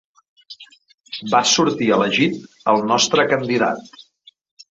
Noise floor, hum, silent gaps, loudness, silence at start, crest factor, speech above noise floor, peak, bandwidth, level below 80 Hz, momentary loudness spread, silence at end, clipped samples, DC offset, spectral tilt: -53 dBFS; none; 0.94-0.98 s; -17 LUFS; 0.5 s; 18 dB; 35 dB; -2 dBFS; 8 kHz; -62 dBFS; 17 LU; 0.9 s; under 0.1%; under 0.1%; -3 dB/octave